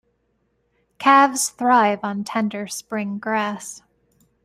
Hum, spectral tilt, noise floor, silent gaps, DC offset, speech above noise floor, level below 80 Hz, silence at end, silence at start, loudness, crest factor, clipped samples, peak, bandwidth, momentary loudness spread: none; -3.5 dB/octave; -68 dBFS; none; under 0.1%; 49 dB; -68 dBFS; 0.65 s; 1 s; -20 LUFS; 20 dB; under 0.1%; -2 dBFS; 16 kHz; 13 LU